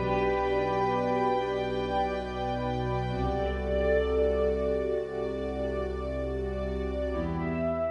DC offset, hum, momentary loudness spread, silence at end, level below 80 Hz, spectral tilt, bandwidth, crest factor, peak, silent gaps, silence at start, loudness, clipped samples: under 0.1%; none; 6 LU; 0 s; -38 dBFS; -7.5 dB/octave; 8.6 kHz; 14 dB; -16 dBFS; none; 0 s; -30 LUFS; under 0.1%